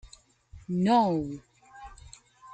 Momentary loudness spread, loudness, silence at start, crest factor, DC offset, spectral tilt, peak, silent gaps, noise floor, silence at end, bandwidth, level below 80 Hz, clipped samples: 26 LU; -26 LUFS; 0.55 s; 18 dB; under 0.1%; -7 dB/octave; -12 dBFS; none; -55 dBFS; 0 s; 9 kHz; -56 dBFS; under 0.1%